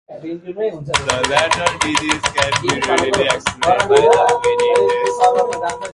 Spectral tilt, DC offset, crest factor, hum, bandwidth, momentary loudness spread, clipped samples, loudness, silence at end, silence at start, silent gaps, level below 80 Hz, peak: -3 dB/octave; under 0.1%; 16 dB; none; 11.5 kHz; 11 LU; under 0.1%; -15 LUFS; 0 s; 0.1 s; none; -44 dBFS; 0 dBFS